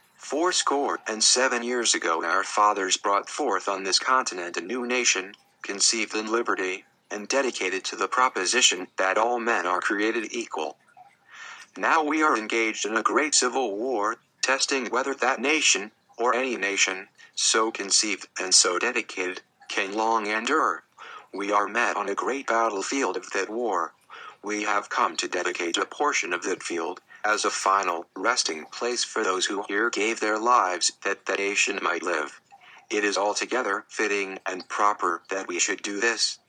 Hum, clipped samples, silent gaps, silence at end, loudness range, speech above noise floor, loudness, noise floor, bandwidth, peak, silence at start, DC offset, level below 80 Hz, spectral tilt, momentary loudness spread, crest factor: none; under 0.1%; none; 0.15 s; 4 LU; 29 dB; -24 LUFS; -54 dBFS; 11 kHz; -6 dBFS; 0.2 s; under 0.1%; under -90 dBFS; 0 dB/octave; 10 LU; 20 dB